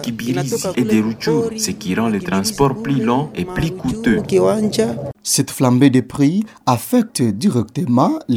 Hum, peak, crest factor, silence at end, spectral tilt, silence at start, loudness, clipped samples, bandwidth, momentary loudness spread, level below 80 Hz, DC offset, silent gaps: none; -2 dBFS; 16 dB; 0 s; -5.5 dB/octave; 0 s; -17 LUFS; under 0.1%; 18 kHz; 6 LU; -44 dBFS; under 0.1%; none